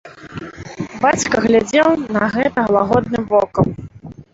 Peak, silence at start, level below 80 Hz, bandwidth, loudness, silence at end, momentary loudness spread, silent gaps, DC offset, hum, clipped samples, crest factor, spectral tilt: -2 dBFS; 0.05 s; -44 dBFS; 8 kHz; -16 LUFS; 0.1 s; 18 LU; none; under 0.1%; none; under 0.1%; 16 dB; -5.5 dB/octave